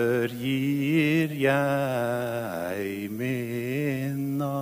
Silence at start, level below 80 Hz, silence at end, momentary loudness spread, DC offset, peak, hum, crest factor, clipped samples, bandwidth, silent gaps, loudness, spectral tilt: 0 s; -64 dBFS; 0 s; 8 LU; under 0.1%; -10 dBFS; none; 16 dB; under 0.1%; 16 kHz; none; -27 LUFS; -6.5 dB/octave